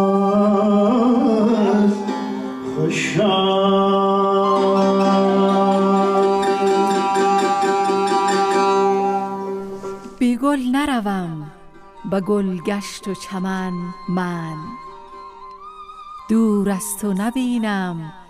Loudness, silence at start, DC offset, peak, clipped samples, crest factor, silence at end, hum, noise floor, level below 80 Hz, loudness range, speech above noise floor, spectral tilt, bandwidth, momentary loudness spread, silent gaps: -18 LUFS; 0 s; under 0.1%; -6 dBFS; under 0.1%; 12 dB; 0.05 s; none; -41 dBFS; -52 dBFS; 8 LU; 20 dB; -6 dB/octave; 15 kHz; 16 LU; none